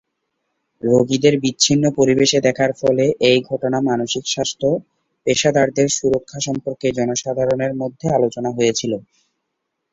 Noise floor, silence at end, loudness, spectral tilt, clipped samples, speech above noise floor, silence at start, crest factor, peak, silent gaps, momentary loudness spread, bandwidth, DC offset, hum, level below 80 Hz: -76 dBFS; 0.9 s; -18 LUFS; -4 dB/octave; under 0.1%; 59 dB; 0.85 s; 18 dB; -2 dBFS; none; 8 LU; 8 kHz; under 0.1%; none; -54 dBFS